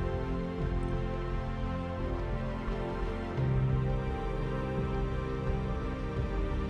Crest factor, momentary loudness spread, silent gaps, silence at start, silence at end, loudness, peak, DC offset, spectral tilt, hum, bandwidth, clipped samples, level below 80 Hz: 14 dB; 5 LU; none; 0 s; 0 s; -34 LUFS; -20 dBFS; under 0.1%; -8.5 dB/octave; none; 7.6 kHz; under 0.1%; -36 dBFS